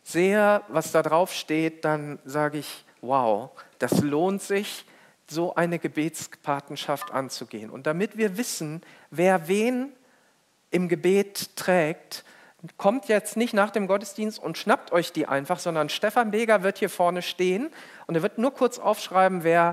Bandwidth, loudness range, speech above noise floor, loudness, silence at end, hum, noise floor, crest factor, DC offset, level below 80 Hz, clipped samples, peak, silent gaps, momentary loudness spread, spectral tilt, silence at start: 16 kHz; 4 LU; 40 dB; -25 LUFS; 0 s; none; -64 dBFS; 20 dB; under 0.1%; -82 dBFS; under 0.1%; -6 dBFS; none; 12 LU; -5 dB/octave; 0.05 s